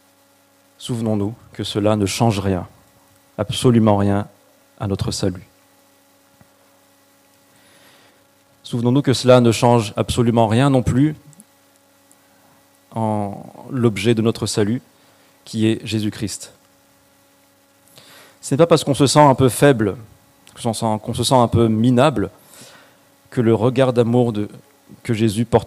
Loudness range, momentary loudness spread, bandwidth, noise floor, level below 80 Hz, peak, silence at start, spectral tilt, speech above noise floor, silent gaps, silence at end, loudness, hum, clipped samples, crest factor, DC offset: 10 LU; 15 LU; 15.5 kHz; -55 dBFS; -48 dBFS; 0 dBFS; 0.8 s; -6 dB/octave; 38 dB; none; 0 s; -18 LUFS; none; under 0.1%; 18 dB; under 0.1%